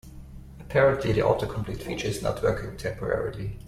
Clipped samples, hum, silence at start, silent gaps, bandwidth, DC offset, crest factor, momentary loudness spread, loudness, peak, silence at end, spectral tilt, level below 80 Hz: under 0.1%; none; 0.05 s; none; 15.5 kHz; under 0.1%; 18 dB; 21 LU; -27 LUFS; -8 dBFS; 0 s; -6 dB/octave; -42 dBFS